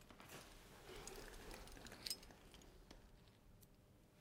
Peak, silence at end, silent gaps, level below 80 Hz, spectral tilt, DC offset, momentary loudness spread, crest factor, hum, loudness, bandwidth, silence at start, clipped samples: -28 dBFS; 0 s; none; -66 dBFS; -2.5 dB/octave; under 0.1%; 19 LU; 32 dB; none; -56 LUFS; 16.5 kHz; 0 s; under 0.1%